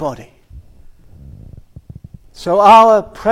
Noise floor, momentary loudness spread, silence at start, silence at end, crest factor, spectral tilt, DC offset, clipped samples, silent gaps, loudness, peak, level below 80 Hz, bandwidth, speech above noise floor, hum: -40 dBFS; 19 LU; 0 s; 0 s; 14 dB; -5.5 dB/octave; under 0.1%; under 0.1%; none; -9 LUFS; 0 dBFS; -42 dBFS; 13.5 kHz; 30 dB; none